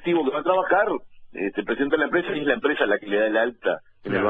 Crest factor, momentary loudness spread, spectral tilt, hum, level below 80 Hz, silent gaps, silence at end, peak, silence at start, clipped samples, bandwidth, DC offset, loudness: 18 dB; 8 LU; -7.5 dB/octave; none; -58 dBFS; none; 0 s; -6 dBFS; 0 s; under 0.1%; 4.2 kHz; under 0.1%; -23 LUFS